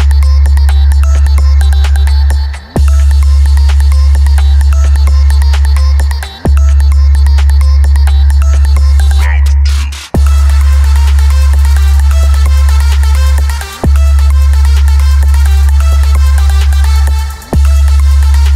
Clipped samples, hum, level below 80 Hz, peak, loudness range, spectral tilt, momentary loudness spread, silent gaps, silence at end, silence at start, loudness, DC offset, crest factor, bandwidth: under 0.1%; none; -6 dBFS; 0 dBFS; 1 LU; -5.5 dB/octave; 4 LU; none; 0 s; 0 s; -8 LUFS; under 0.1%; 6 dB; 13.5 kHz